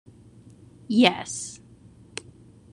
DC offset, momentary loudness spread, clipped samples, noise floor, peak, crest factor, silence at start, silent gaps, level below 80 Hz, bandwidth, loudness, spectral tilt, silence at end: under 0.1%; 20 LU; under 0.1%; -51 dBFS; -2 dBFS; 26 dB; 0.9 s; none; -64 dBFS; 11 kHz; -23 LUFS; -3.5 dB/octave; 1.15 s